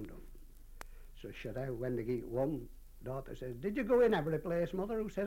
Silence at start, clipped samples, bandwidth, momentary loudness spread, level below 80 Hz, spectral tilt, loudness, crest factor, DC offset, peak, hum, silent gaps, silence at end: 0 s; under 0.1%; 16.5 kHz; 24 LU; -52 dBFS; -7.5 dB/octave; -36 LUFS; 18 dB; under 0.1%; -20 dBFS; none; none; 0 s